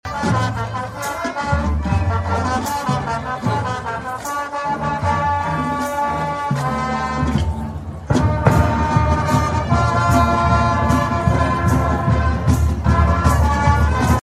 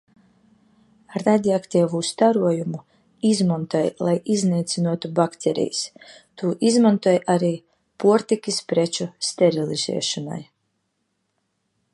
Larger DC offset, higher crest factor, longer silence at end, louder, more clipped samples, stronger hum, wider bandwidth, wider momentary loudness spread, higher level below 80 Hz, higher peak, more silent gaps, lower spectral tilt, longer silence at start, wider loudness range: neither; about the same, 16 dB vs 18 dB; second, 0.1 s vs 1.5 s; first, -18 LUFS vs -21 LUFS; neither; neither; first, 14 kHz vs 11.5 kHz; about the same, 8 LU vs 10 LU; first, -26 dBFS vs -68 dBFS; first, 0 dBFS vs -4 dBFS; neither; about the same, -6.5 dB/octave vs -5.5 dB/octave; second, 0.05 s vs 1.1 s; about the same, 5 LU vs 3 LU